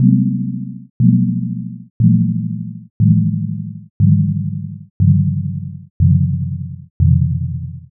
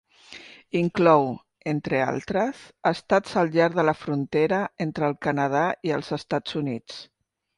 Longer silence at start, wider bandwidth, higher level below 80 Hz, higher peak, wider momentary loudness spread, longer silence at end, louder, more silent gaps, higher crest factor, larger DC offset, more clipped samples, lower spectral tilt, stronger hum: second, 0 s vs 0.3 s; second, 0.6 kHz vs 11.5 kHz; first, -36 dBFS vs -62 dBFS; first, 0 dBFS vs -6 dBFS; about the same, 14 LU vs 13 LU; second, 0.15 s vs 0.55 s; first, -17 LUFS vs -24 LUFS; first, 0.90-1.00 s, 1.90-2.00 s, 2.90-3.00 s, 3.90-4.00 s, 4.90-5.00 s, 5.90-6.00 s, 6.90-7.00 s vs none; about the same, 16 dB vs 20 dB; neither; neither; first, -23 dB/octave vs -6.5 dB/octave; neither